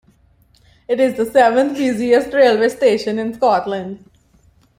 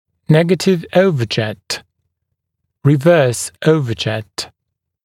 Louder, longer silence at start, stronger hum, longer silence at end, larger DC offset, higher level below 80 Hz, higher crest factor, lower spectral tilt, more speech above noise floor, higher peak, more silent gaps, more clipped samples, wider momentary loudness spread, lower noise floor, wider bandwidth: about the same, -16 LUFS vs -15 LUFS; first, 0.9 s vs 0.3 s; neither; first, 0.85 s vs 0.6 s; neither; about the same, -56 dBFS vs -56 dBFS; about the same, 16 dB vs 16 dB; about the same, -5 dB/octave vs -5.5 dB/octave; second, 39 dB vs 62 dB; about the same, -2 dBFS vs 0 dBFS; neither; neither; about the same, 11 LU vs 13 LU; second, -54 dBFS vs -77 dBFS; about the same, 16 kHz vs 15.5 kHz